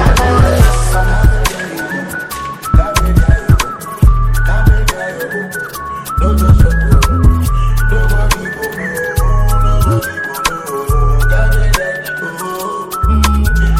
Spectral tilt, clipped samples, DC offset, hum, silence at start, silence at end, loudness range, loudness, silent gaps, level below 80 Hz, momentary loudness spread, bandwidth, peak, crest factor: -5.5 dB/octave; 0.8%; under 0.1%; none; 0 s; 0 s; 2 LU; -14 LUFS; none; -14 dBFS; 10 LU; 16.5 kHz; 0 dBFS; 10 dB